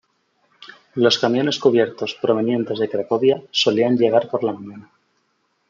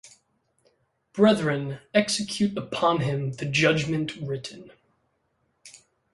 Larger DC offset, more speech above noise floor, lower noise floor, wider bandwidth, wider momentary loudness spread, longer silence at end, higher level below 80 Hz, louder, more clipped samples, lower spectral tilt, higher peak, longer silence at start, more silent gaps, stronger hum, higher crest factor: neither; about the same, 49 dB vs 48 dB; second, -68 dBFS vs -72 dBFS; second, 7.6 kHz vs 11.5 kHz; second, 7 LU vs 12 LU; first, 0.9 s vs 0.35 s; second, -70 dBFS vs -60 dBFS; first, -19 LUFS vs -25 LUFS; neither; about the same, -5 dB/octave vs -5 dB/octave; first, -2 dBFS vs -6 dBFS; first, 0.95 s vs 0.05 s; neither; neither; about the same, 18 dB vs 20 dB